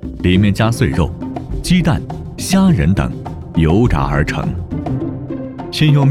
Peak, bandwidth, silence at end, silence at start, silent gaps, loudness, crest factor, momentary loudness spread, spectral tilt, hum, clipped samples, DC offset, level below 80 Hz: 0 dBFS; 15 kHz; 0 s; 0 s; none; -16 LUFS; 14 dB; 12 LU; -6.5 dB/octave; none; under 0.1%; under 0.1%; -28 dBFS